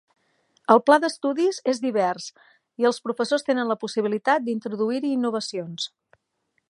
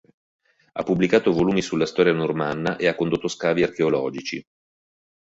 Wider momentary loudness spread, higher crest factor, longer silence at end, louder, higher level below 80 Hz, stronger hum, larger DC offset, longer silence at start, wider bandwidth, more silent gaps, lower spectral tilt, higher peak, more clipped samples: about the same, 12 LU vs 12 LU; about the same, 22 dB vs 20 dB; about the same, 0.8 s vs 0.85 s; about the same, -23 LUFS vs -22 LUFS; second, -80 dBFS vs -56 dBFS; neither; neither; about the same, 0.7 s vs 0.75 s; first, 11.5 kHz vs 8 kHz; neither; second, -4.5 dB/octave vs -6 dB/octave; about the same, -2 dBFS vs -4 dBFS; neither